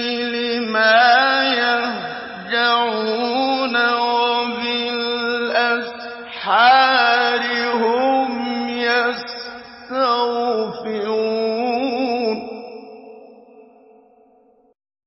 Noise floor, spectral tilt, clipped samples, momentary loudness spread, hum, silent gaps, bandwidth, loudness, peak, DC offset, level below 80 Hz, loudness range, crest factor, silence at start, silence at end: -55 dBFS; -6 dB/octave; under 0.1%; 15 LU; none; none; 5.8 kHz; -18 LUFS; -2 dBFS; under 0.1%; -64 dBFS; 7 LU; 16 dB; 0 s; 1.45 s